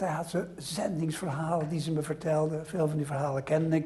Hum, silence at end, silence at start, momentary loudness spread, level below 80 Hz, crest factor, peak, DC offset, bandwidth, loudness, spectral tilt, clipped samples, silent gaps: none; 0 s; 0 s; 4 LU; -62 dBFS; 16 dB; -14 dBFS; under 0.1%; 12.5 kHz; -31 LUFS; -6.5 dB/octave; under 0.1%; none